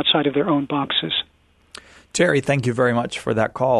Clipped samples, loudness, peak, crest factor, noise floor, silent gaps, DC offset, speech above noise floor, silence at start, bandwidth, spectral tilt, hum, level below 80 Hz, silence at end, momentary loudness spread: under 0.1%; -20 LUFS; -4 dBFS; 16 dB; -45 dBFS; none; under 0.1%; 25 dB; 0 s; 12 kHz; -4.5 dB/octave; none; -54 dBFS; 0 s; 6 LU